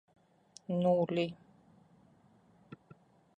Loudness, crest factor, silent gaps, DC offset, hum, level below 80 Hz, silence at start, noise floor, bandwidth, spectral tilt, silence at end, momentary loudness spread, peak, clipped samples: -33 LUFS; 18 dB; none; under 0.1%; none; -76 dBFS; 0.7 s; -65 dBFS; 9.6 kHz; -7.5 dB/octave; 0.65 s; 27 LU; -18 dBFS; under 0.1%